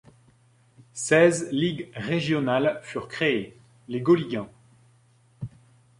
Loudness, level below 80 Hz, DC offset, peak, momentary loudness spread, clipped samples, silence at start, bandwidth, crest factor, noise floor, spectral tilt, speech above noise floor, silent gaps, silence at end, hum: -24 LUFS; -62 dBFS; under 0.1%; -6 dBFS; 21 LU; under 0.1%; 0.95 s; 11.5 kHz; 22 dB; -60 dBFS; -5 dB/octave; 36 dB; none; 0.5 s; none